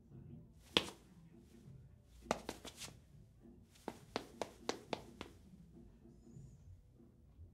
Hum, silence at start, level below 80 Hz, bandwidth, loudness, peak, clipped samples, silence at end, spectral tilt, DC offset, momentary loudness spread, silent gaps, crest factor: none; 0 s; -68 dBFS; 16 kHz; -45 LUFS; -10 dBFS; under 0.1%; 0 s; -3.5 dB/octave; under 0.1%; 22 LU; none; 38 dB